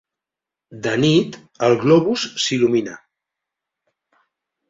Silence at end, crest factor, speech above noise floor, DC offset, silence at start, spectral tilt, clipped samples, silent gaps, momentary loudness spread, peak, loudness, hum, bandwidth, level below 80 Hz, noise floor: 1.75 s; 18 dB; 70 dB; under 0.1%; 0.7 s; -5 dB/octave; under 0.1%; none; 11 LU; -2 dBFS; -18 LUFS; none; 7.8 kHz; -58 dBFS; -87 dBFS